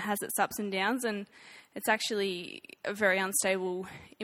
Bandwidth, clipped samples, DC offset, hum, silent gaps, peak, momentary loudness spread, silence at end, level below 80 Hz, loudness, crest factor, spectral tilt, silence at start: 17 kHz; under 0.1%; under 0.1%; none; none; -12 dBFS; 14 LU; 0 s; -72 dBFS; -31 LUFS; 20 dB; -2.5 dB/octave; 0 s